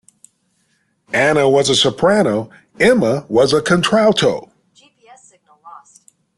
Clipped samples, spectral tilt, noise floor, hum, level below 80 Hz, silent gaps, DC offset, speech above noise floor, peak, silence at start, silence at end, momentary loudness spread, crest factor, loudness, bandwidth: under 0.1%; -4.5 dB/octave; -63 dBFS; none; -52 dBFS; none; under 0.1%; 50 dB; -2 dBFS; 1.15 s; 0.6 s; 7 LU; 16 dB; -14 LUFS; 12.5 kHz